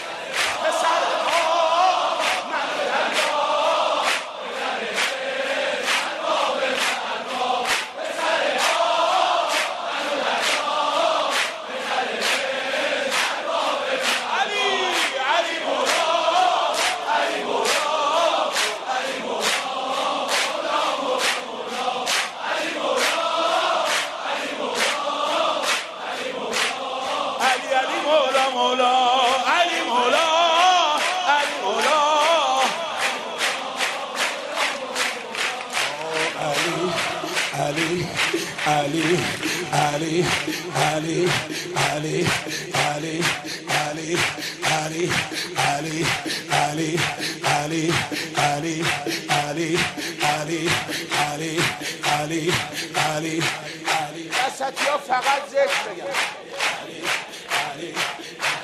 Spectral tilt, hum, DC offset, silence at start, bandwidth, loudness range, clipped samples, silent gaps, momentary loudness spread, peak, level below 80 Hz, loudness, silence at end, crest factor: -2.5 dB/octave; none; under 0.1%; 0 s; 13 kHz; 4 LU; under 0.1%; none; 6 LU; -4 dBFS; -60 dBFS; -22 LUFS; 0 s; 18 dB